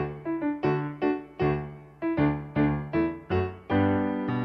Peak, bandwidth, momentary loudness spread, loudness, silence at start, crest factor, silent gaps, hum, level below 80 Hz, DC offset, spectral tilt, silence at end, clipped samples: -12 dBFS; 5.8 kHz; 5 LU; -28 LUFS; 0 s; 14 dB; none; none; -50 dBFS; under 0.1%; -10 dB/octave; 0 s; under 0.1%